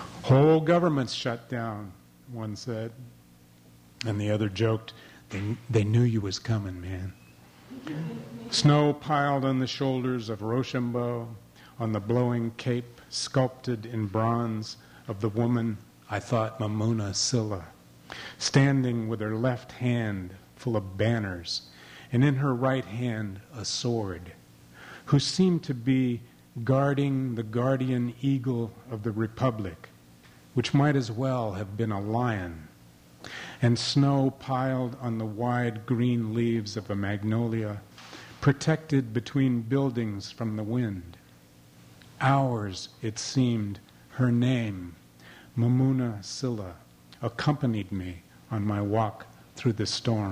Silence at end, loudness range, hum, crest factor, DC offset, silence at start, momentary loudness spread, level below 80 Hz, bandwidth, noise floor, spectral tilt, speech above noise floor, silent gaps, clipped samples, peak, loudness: 0 s; 3 LU; none; 20 dB; under 0.1%; 0 s; 16 LU; -60 dBFS; 15 kHz; -55 dBFS; -6 dB/octave; 28 dB; none; under 0.1%; -8 dBFS; -28 LUFS